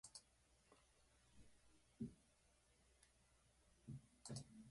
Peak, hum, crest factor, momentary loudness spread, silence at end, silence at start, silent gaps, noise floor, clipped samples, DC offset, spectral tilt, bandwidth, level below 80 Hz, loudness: -40 dBFS; none; 24 dB; 7 LU; 0 s; 0.05 s; none; -78 dBFS; under 0.1%; under 0.1%; -5 dB/octave; 11.5 kHz; -78 dBFS; -58 LUFS